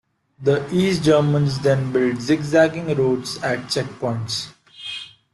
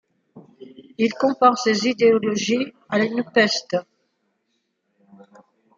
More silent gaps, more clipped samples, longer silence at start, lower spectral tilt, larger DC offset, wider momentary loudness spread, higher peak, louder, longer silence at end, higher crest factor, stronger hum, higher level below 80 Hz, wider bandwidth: neither; neither; about the same, 0.4 s vs 0.35 s; first, -6 dB/octave vs -4 dB/octave; neither; first, 14 LU vs 8 LU; about the same, -2 dBFS vs -2 dBFS; about the same, -20 LUFS vs -20 LUFS; second, 0.25 s vs 1.95 s; about the same, 18 dB vs 20 dB; neither; first, -54 dBFS vs -70 dBFS; first, 12 kHz vs 7.6 kHz